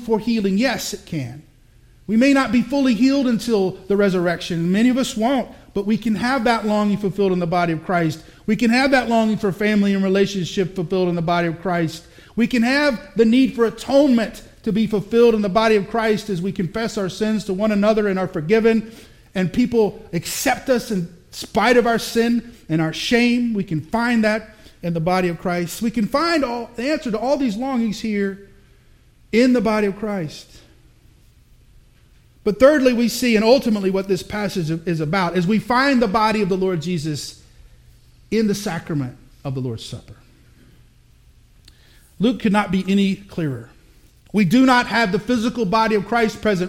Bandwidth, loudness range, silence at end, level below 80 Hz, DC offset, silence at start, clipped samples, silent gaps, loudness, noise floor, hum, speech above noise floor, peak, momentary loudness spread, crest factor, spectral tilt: 16.5 kHz; 5 LU; 0 s; -48 dBFS; under 0.1%; 0 s; under 0.1%; none; -19 LUFS; -51 dBFS; none; 33 dB; 0 dBFS; 11 LU; 20 dB; -5.5 dB/octave